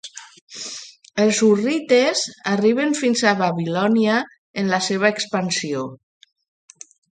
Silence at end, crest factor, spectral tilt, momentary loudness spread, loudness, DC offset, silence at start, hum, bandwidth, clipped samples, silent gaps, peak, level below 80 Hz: 1.25 s; 18 dB; -4 dB/octave; 15 LU; -19 LUFS; under 0.1%; 0.05 s; none; 9.4 kHz; under 0.1%; 0.42-0.47 s, 4.38-4.54 s; -2 dBFS; -68 dBFS